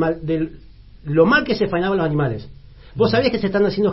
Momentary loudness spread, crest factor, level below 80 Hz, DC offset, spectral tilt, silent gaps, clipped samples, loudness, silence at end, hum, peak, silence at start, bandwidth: 13 LU; 18 dB; -42 dBFS; under 0.1%; -10.5 dB/octave; none; under 0.1%; -19 LUFS; 0 s; none; -2 dBFS; 0 s; 5.8 kHz